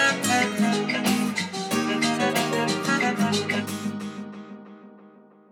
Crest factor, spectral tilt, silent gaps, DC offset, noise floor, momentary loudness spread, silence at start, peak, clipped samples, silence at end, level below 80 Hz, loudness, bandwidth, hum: 16 dB; -3.5 dB/octave; none; under 0.1%; -51 dBFS; 15 LU; 0 s; -8 dBFS; under 0.1%; 0.4 s; -78 dBFS; -24 LUFS; 19.5 kHz; none